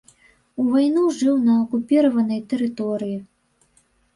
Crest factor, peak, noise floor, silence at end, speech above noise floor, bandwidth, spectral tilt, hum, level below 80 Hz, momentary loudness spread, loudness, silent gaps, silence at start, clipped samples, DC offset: 14 dB; -8 dBFS; -62 dBFS; 0.9 s; 42 dB; 11 kHz; -6.5 dB/octave; none; -64 dBFS; 10 LU; -20 LUFS; none; 0.6 s; under 0.1%; under 0.1%